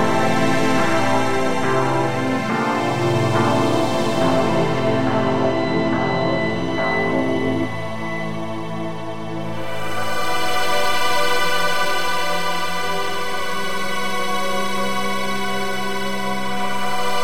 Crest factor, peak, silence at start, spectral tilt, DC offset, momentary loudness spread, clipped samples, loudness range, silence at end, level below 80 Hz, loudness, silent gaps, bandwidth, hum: 14 dB; -4 dBFS; 0 s; -4.5 dB/octave; 7%; 8 LU; under 0.1%; 5 LU; 0 s; -48 dBFS; -21 LUFS; none; 16 kHz; none